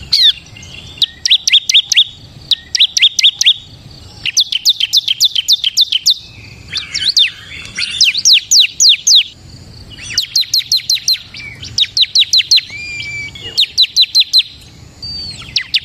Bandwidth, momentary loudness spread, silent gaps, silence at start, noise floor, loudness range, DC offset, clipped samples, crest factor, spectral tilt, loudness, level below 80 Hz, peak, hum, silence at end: 16 kHz; 15 LU; none; 0 s; -37 dBFS; 3 LU; under 0.1%; under 0.1%; 14 dB; 2 dB/octave; -9 LUFS; -46 dBFS; 0 dBFS; none; 0 s